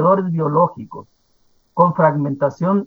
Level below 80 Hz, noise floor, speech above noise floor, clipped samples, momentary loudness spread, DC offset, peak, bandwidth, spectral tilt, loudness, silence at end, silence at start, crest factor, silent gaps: -64 dBFS; -59 dBFS; 42 dB; under 0.1%; 20 LU; under 0.1%; 0 dBFS; 6.8 kHz; -10.5 dB/octave; -17 LUFS; 0 s; 0 s; 18 dB; none